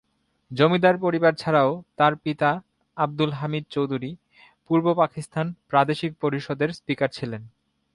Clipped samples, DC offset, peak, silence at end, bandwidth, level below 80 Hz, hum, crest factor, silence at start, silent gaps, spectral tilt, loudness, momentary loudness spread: under 0.1%; under 0.1%; -6 dBFS; 0.45 s; 11.5 kHz; -64 dBFS; none; 18 dB; 0.5 s; none; -7 dB/octave; -23 LUFS; 11 LU